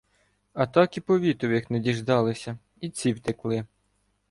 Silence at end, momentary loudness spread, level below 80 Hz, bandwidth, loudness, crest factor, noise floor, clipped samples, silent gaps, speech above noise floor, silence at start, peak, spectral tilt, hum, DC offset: 0.65 s; 14 LU; -60 dBFS; 11.5 kHz; -26 LUFS; 20 dB; -71 dBFS; under 0.1%; none; 46 dB; 0.55 s; -6 dBFS; -6.5 dB/octave; none; under 0.1%